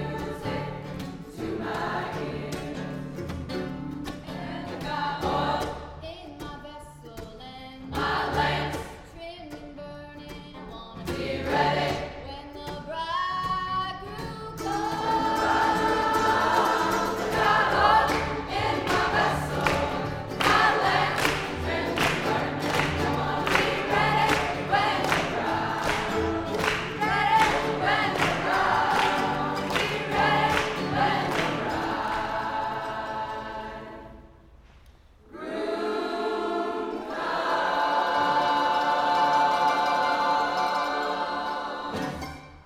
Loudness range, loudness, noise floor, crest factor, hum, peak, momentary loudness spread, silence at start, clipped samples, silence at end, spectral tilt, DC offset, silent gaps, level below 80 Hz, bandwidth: 9 LU; -26 LUFS; -53 dBFS; 22 dB; none; -6 dBFS; 17 LU; 0 s; under 0.1%; 0.05 s; -4.5 dB/octave; under 0.1%; none; -48 dBFS; 17 kHz